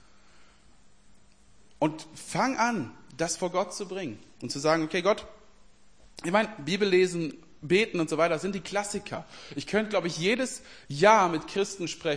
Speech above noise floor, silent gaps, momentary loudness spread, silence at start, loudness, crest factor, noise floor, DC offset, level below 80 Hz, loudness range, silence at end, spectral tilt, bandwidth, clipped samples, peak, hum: 32 dB; none; 15 LU; 1.8 s; -27 LUFS; 22 dB; -60 dBFS; 0.2%; -62 dBFS; 4 LU; 0 s; -4 dB/octave; 10.5 kHz; under 0.1%; -6 dBFS; none